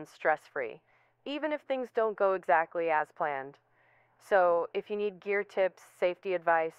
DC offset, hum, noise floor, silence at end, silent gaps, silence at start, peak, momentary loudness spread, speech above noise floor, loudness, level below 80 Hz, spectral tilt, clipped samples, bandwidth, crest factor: under 0.1%; none; -67 dBFS; 0.1 s; none; 0 s; -12 dBFS; 11 LU; 36 dB; -31 LUFS; -80 dBFS; -5.5 dB/octave; under 0.1%; 12.5 kHz; 20 dB